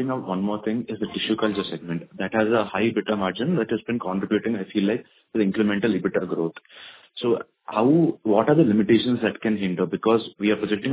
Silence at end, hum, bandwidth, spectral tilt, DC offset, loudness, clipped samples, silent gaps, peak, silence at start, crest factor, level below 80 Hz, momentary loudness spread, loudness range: 0 s; none; 4 kHz; -11 dB/octave; under 0.1%; -23 LUFS; under 0.1%; none; -4 dBFS; 0 s; 18 dB; -60 dBFS; 10 LU; 4 LU